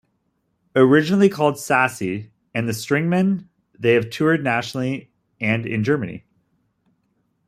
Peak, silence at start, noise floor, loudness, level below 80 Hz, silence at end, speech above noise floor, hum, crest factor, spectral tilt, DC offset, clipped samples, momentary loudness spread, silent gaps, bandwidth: -2 dBFS; 0.75 s; -70 dBFS; -20 LUFS; -62 dBFS; 1.3 s; 51 dB; none; 18 dB; -6 dB/octave; under 0.1%; under 0.1%; 13 LU; none; 15.5 kHz